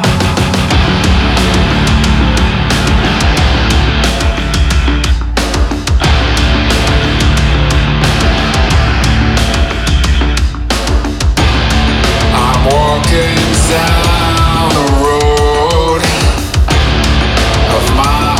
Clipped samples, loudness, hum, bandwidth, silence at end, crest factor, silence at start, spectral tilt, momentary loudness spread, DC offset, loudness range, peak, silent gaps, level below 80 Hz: under 0.1%; -11 LUFS; none; 15 kHz; 0 s; 10 dB; 0 s; -5 dB/octave; 3 LU; under 0.1%; 2 LU; 0 dBFS; none; -14 dBFS